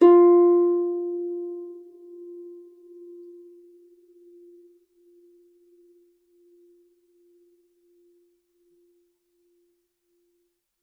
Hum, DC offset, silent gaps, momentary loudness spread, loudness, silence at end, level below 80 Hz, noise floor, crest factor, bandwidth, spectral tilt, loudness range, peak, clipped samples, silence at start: none; under 0.1%; none; 31 LU; -20 LUFS; 8.3 s; under -90 dBFS; -74 dBFS; 20 dB; 3 kHz; -7 dB/octave; 28 LU; -6 dBFS; under 0.1%; 0 s